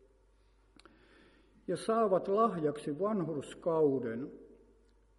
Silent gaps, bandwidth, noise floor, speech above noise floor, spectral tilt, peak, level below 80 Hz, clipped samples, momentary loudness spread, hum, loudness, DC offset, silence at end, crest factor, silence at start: none; 11.5 kHz; -67 dBFS; 34 dB; -7 dB/octave; -16 dBFS; -68 dBFS; under 0.1%; 11 LU; none; -33 LUFS; under 0.1%; 0.7 s; 18 dB; 1.7 s